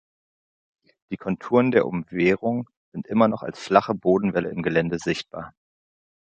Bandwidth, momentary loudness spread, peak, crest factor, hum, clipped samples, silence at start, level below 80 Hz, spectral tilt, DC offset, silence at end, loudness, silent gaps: 8.8 kHz; 16 LU; -2 dBFS; 22 dB; none; under 0.1%; 1.1 s; -58 dBFS; -7 dB/octave; under 0.1%; 0.9 s; -23 LUFS; 2.77-2.92 s